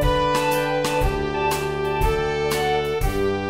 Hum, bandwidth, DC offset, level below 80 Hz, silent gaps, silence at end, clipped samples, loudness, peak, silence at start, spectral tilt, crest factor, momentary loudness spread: none; 16 kHz; 0.5%; -30 dBFS; none; 0 s; under 0.1%; -22 LUFS; -8 dBFS; 0 s; -5 dB/octave; 14 dB; 3 LU